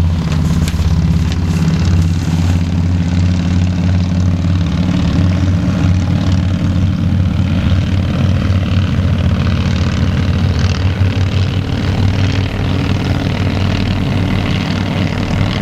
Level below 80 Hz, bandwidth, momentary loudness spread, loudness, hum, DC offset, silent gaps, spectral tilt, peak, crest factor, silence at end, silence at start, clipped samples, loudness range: -24 dBFS; 8.8 kHz; 2 LU; -14 LUFS; none; under 0.1%; none; -7 dB/octave; 0 dBFS; 12 dB; 0 s; 0 s; under 0.1%; 1 LU